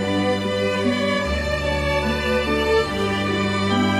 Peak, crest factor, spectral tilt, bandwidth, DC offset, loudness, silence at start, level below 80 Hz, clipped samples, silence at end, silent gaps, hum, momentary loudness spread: -8 dBFS; 12 dB; -5.5 dB/octave; 15.5 kHz; under 0.1%; -21 LUFS; 0 s; -34 dBFS; under 0.1%; 0 s; none; none; 2 LU